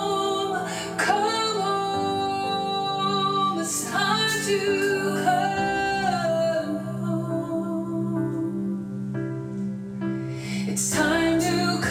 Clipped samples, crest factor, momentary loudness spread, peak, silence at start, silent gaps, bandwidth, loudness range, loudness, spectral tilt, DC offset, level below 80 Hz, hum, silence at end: under 0.1%; 16 dB; 8 LU; -10 dBFS; 0 s; none; 16.5 kHz; 5 LU; -25 LUFS; -4 dB/octave; under 0.1%; -56 dBFS; none; 0 s